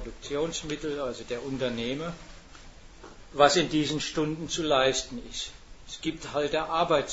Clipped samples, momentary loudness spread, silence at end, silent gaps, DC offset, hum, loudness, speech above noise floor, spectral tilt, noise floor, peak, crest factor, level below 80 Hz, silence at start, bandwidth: under 0.1%; 14 LU; 0 s; none; under 0.1%; none; -28 LUFS; 20 dB; -3.5 dB/octave; -48 dBFS; -6 dBFS; 24 dB; -50 dBFS; 0 s; 8 kHz